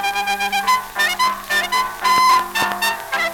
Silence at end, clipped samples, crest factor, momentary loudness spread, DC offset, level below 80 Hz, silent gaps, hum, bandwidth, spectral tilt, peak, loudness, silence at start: 0 s; under 0.1%; 16 dB; 6 LU; under 0.1%; -50 dBFS; none; none; over 20 kHz; -0.5 dB/octave; -4 dBFS; -17 LUFS; 0 s